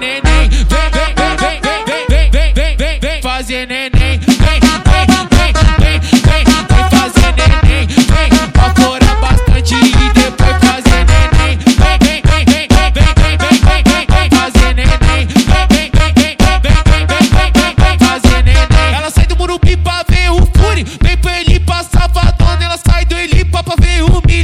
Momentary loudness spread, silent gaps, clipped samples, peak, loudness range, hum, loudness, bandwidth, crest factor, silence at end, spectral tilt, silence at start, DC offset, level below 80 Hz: 5 LU; none; 3%; 0 dBFS; 3 LU; none; -10 LUFS; 14.5 kHz; 8 dB; 0 s; -5 dB/octave; 0 s; under 0.1%; -12 dBFS